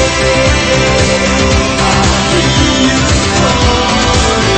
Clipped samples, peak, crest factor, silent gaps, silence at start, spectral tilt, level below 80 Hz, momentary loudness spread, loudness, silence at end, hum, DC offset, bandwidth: under 0.1%; 0 dBFS; 10 dB; none; 0 s; -4 dB/octave; -20 dBFS; 1 LU; -10 LUFS; 0 s; none; under 0.1%; 8.8 kHz